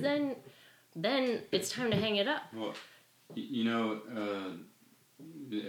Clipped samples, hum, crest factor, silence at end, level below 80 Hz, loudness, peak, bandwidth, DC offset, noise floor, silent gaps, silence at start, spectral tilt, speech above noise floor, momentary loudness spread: under 0.1%; none; 18 dB; 0 s; -72 dBFS; -34 LUFS; -16 dBFS; 19 kHz; under 0.1%; -62 dBFS; none; 0 s; -4.5 dB/octave; 28 dB; 19 LU